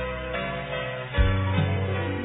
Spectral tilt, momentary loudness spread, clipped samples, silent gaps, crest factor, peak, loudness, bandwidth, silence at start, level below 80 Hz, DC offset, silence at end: -10.5 dB/octave; 6 LU; under 0.1%; none; 16 dB; -10 dBFS; -27 LUFS; 4 kHz; 0 s; -32 dBFS; under 0.1%; 0 s